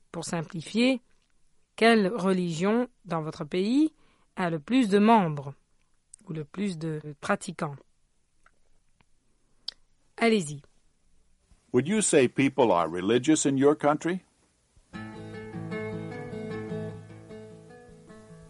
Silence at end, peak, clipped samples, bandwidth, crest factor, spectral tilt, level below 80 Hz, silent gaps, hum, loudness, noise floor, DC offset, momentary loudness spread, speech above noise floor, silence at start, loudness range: 0.05 s; -8 dBFS; under 0.1%; 11.5 kHz; 20 dB; -5 dB/octave; -64 dBFS; none; none; -26 LUFS; -67 dBFS; under 0.1%; 19 LU; 41 dB; 0.15 s; 13 LU